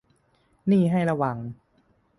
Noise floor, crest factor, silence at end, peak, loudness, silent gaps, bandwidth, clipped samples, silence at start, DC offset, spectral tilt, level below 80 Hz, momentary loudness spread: -65 dBFS; 16 dB; 0.65 s; -10 dBFS; -24 LUFS; none; 11 kHz; under 0.1%; 0.65 s; under 0.1%; -9 dB/octave; -62 dBFS; 14 LU